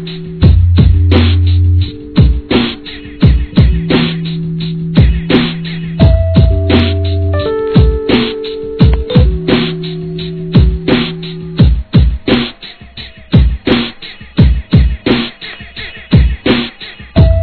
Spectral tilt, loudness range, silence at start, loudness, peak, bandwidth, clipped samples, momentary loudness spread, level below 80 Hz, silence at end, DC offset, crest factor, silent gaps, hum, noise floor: -10 dB/octave; 3 LU; 0 s; -12 LUFS; 0 dBFS; 4.6 kHz; 0.9%; 13 LU; -16 dBFS; 0 s; 0.3%; 10 dB; none; none; -31 dBFS